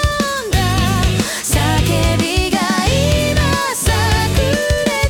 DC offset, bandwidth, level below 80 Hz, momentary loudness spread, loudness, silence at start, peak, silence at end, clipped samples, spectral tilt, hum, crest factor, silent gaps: under 0.1%; 18 kHz; -22 dBFS; 2 LU; -15 LUFS; 0 s; -2 dBFS; 0 s; under 0.1%; -4.5 dB/octave; none; 12 dB; none